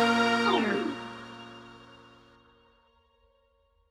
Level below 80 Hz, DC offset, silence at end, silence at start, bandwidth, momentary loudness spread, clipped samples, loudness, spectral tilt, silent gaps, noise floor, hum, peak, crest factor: -68 dBFS; under 0.1%; 2.15 s; 0 s; 12.5 kHz; 25 LU; under 0.1%; -27 LUFS; -4 dB/octave; none; -68 dBFS; none; -12 dBFS; 18 dB